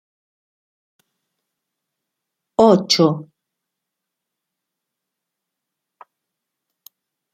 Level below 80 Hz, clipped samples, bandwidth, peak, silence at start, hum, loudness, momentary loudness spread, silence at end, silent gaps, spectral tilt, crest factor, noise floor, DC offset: -64 dBFS; under 0.1%; 15.5 kHz; -2 dBFS; 2.6 s; none; -15 LUFS; 13 LU; 4.1 s; none; -5 dB/octave; 22 dB; -82 dBFS; under 0.1%